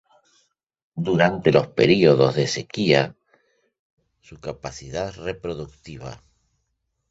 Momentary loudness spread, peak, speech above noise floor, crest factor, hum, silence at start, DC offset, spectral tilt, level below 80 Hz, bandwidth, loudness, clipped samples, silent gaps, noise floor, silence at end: 21 LU; -2 dBFS; 54 dB; 22 dB; none; 0.95 s; under 0.1%; -6 dB/octave; -52 dBFS; 8 kHz; -20 LUFS; under 0.1%; 3.79-3.97 s; -75 dBFS; 0.95 s